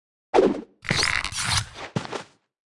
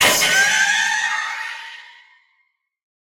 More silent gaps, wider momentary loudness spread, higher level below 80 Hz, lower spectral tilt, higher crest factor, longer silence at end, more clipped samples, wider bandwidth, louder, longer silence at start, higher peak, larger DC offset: neither; second, 11 LU vs 20 LU; first, -46 dBFS vs -58 dBFS; first, -3.5 dB/octave vs 0.5 dB/octave; about the same, 20 dB vs 18 dB; second, 0.45 s vs 1.15 s; neither; second, 12 kHz vs over 20 kHz; second, -24 LUFS vs -16 LUFS; first, 0.35 s vs 0 s; second, -6 dBFS vs -2 dBFS; neither